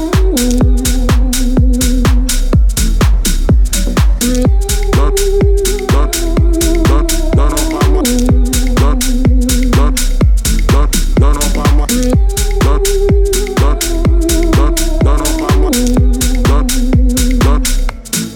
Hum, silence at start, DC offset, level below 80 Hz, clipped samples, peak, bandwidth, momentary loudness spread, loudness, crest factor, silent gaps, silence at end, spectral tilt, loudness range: none; 0 s; under 0.1%; -12 dBFS; under 0.1%; 0 dBFS; 17.5 kHz; 2 LU; -12 LUFS; 10 dB; none; 0 s; -5 dB/octave; 0 LU